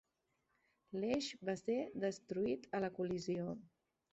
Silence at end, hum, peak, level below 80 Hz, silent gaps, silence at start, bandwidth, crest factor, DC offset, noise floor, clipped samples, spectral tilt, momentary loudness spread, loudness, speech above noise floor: 0.45 s; none; -24 dBFS; -74 dBFS; none; 0.9 s; 8 kHz; 18 dB; under 0.1%; -84 dBFS; under 0.1%; -5 dB/octave; 5 LU; -41 LUFS; 44 dB